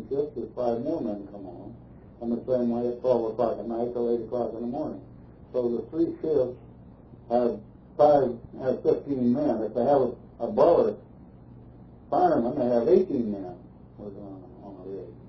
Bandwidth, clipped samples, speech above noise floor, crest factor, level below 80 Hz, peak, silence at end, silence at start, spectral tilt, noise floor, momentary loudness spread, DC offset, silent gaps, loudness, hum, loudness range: 5.4 kHz; under 0.1%; 23 dB; 20 dB; -56 dBFS; -8 dBFS; 0 s; 0 s; -10 dB/octave; -48 dBFS; 20 LU; under 0.1%; none; -26 LUFS; none; 5 LU